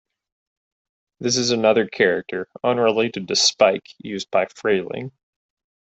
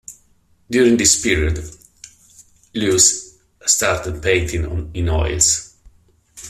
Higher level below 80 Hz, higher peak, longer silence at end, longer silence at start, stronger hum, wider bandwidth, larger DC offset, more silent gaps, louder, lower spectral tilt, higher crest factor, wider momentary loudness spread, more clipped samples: second, -64 dBFS vs -34 dBFS; about the same, -2 dBFS vs 0 dBFS; first, 0.85 s vs 0 s; first, 1.2 s vs 0.1 s; neither; second, 8.4 kHz vs 14.5 kHz; neither; neither; second, -20 LUFS vs -16 LUFS; about the same, -3 dB/octave vs -3 dB/octave; about the same, 20 dB vs 20 dB; about the same, 13 LU vs 12 LU; neither